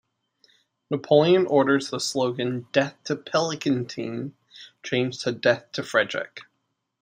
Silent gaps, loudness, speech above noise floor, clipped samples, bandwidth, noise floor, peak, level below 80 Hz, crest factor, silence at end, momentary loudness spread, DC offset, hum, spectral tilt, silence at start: none; -24 LUFS; 53 dB; under 0.1%; 16 kHz; -77 dBFS; -6 dBFS; -70 dBFS; 20 dB; 0.6 s; 13 LU; under 0.1%; none; -5 dB/octave; 0.9 s